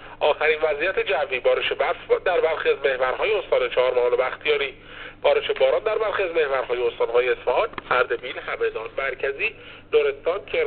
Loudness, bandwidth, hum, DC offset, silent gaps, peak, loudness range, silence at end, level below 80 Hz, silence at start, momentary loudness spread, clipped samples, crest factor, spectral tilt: -22 LUFS; 4.5 kHz; none; under 0.1%; none; -6 dBFS; 2 LU; 0 s; -50 dBFS; 0 s; 6 LU; under 0.1%; 16 dB; 0 dB/octave